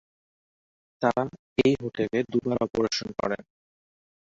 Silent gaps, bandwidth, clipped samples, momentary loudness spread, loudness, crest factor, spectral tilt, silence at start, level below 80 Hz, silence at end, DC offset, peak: 1.39-1.56 s; 7.8 kHz; under 0.1%; 7 LU; -27 LUFS; 20 dB; -5.5 dB/octave; 1 s; -58 dBFS; 0.9 s; under 0.1%; -8 dBFS